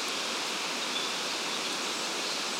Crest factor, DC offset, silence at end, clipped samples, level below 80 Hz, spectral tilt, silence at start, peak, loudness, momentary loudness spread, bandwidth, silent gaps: 14 dB; under 0.1%; 0 s; under 0.1%; under -90 dBFS; 0 dB/octave; 0 s; -18 dBFS; -30 LUFS; 1 LU; 16 kHz; none